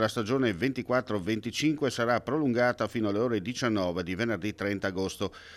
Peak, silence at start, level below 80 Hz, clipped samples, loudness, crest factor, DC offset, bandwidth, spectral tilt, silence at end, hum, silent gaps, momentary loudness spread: -14 dBFS; 0 s; -62 dBFS; under 0.1%; -29 LUFS; 14 dB; under 0.1%; 15 kHz; -5.5 dB/octave; 0 s; none; none; 5 LU